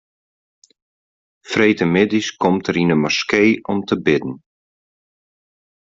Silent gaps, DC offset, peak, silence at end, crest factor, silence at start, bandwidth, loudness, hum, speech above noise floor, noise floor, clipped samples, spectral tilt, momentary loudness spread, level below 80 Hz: none; under 0.1%; -2 dBFS; 1.45 s; 18 dB; 1.45 s; 7.8 kHz; -17 LUFS; none; over 73 dB; under -90 dBFS; under 0.1%; -5.5 dB/octave; 6 LU; -56 dBFS